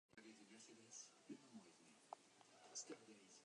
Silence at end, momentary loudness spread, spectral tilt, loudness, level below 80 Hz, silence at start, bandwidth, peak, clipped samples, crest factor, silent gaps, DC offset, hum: 0 s; 13 LU; -2 dB/octave; -61 LUFS; under -90 dBFS; 0.1 s; 10.5 kHz; -38 dBFS; under 0.1%; 26 dB; none; under 0.1%; none